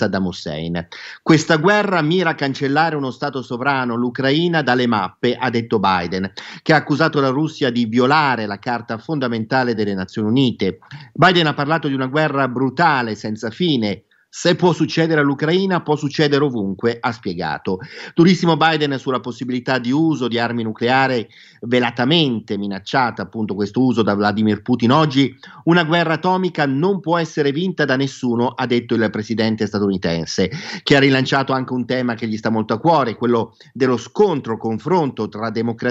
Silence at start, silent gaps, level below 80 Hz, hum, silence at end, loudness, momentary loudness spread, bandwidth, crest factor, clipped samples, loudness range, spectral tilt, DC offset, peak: 0 s; none; -58 dBFS; none; 0 s; -18 LUFS; 10 LU; 8 kHz; 16 dB; under 0.1%; 2 LU; -6 dB/octave; under 0.1%; 0 dBFS